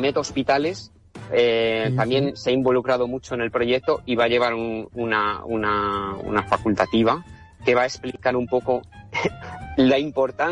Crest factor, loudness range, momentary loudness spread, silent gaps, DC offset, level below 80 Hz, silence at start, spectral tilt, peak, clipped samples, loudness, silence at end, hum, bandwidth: 14 dB; 1 LU; 8 LU; none; under 0.1%; -50 dBFS; 0 s; -5.5 dB/octave; -8 dBFS; under 0.1%; -22 LUFS; 0 s; none; 10.5 kHz